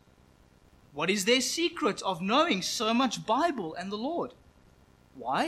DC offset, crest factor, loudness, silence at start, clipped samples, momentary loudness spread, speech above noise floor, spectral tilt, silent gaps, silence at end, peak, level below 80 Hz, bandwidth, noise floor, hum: under 0.1%; 18 dB; -28 LUFS; 0.95 s; under 0.1%; 11 LU; 31 dB; -3 dB/octave; none; 0 s; -12 dBFS; -66 dBFS; 16 kHz; -60 dBFS; none